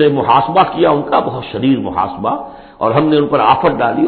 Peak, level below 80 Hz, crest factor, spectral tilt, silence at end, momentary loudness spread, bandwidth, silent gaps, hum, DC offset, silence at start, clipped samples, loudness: 0 dBFS; -44 dBFS; 14 dB; -10.5 dB/octave; 0 s; 9 LU; 4.5 kHz; none; none; under 0.1%; 0 s; under 0.1%; -13 LUFS